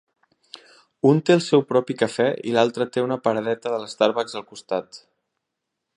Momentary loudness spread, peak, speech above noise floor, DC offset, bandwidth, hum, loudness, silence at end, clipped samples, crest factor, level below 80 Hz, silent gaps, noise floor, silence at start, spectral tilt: 11 LU; -2 dBFS; 60 dB; under 0.1%; 11 kHz; none; -22 LUFS; 1 s; under 0.1%; 20 dB; -70 dBFS; none; -81 dBFS; 1.05 s; -6 dB/octave